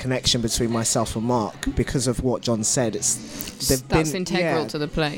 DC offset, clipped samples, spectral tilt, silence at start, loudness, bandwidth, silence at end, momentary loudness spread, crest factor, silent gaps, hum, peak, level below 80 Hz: under 0.1%; under 0.1%; -4 dB/octave; 0 s; -22 LUFS; 17 kHz; 0 s; 5 LU; 18 dB; none; none; -6 dBFS; -38 dBFS